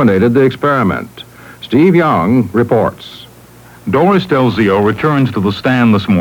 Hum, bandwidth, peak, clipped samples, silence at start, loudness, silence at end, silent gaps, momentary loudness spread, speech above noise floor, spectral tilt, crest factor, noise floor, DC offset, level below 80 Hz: none; 19.5 kHz; 0 dBFS; under 0.1%; 0 s; -12 LUFS; 0 s; none; 15 LU; 27 dB; -8 dB/octave; 12 dB; -38 dBFS; under 0.1%; -46 dBFS